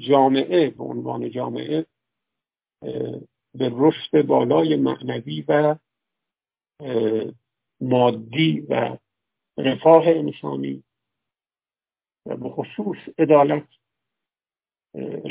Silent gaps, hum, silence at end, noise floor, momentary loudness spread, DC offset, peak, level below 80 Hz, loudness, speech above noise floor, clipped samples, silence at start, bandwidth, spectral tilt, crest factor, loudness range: none; none; 0 s; under -90 dBFS; 17 LU; under 0.1%; 0 dBFS; -70 dBFS; -21 LUFS; over 70 dB; under 0.1%; 0 s; 4 kHz; -10.5 dB/octave; 22 dB; 5 LU